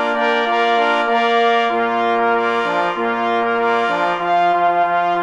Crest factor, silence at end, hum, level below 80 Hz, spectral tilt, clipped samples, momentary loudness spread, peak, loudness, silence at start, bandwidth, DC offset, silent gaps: 12 dB; 0 s; none; -60 dBFS; -4.5 dB/octave; under 0.1%; 3 LU; -4 dBFS; -16 LUFS; 0 s; 8.8 kHz; under 0.1%; none